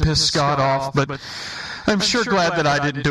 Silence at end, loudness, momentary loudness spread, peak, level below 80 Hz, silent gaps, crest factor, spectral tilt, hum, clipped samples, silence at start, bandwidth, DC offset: 0 s; -19 LUFS; 12 LU; -4 dBFS; -36 dBFS; none; 16 dB; -4 dB/octave; none; under 0.1%; 0 s; 12.5 kHz; under 0.1%